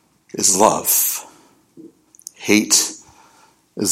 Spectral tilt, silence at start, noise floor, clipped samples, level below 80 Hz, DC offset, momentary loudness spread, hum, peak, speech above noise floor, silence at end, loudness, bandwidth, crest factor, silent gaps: -1.5 dB/octave; 0.35 s; -54 dBFS; under 0.1%; -62 dBFS; under 0.1%; 16 LU; none; 0 dBFS; 37 dB; 0 s; -16 LUFS; 16.5 kHz; 20 dB; none